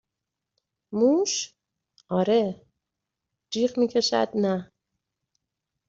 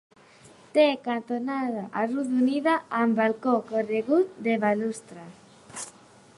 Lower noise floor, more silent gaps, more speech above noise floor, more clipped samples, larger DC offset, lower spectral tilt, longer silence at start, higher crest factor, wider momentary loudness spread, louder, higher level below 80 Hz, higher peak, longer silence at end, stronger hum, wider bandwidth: first, -85 dBFS vs -53 dBFS; neither; first, 62 dB vs 28 dB; neither; neither; about the same, -4.5 dB/octave vs -5 dB/octave; first, 0.9 s vs 0.75 s; about the same, 18 dB vs 18 dB; second, 12 LU vs 16 LU; about the same, -25 LUFS vs -25 LUFS; first, -68 dBFS vs -76 dBFS; about the same, -10 dBFS vs -8 dBFS; first, 1.25 s vs 0.45 s; neither; second, 8 kHz vs 11.5 kHz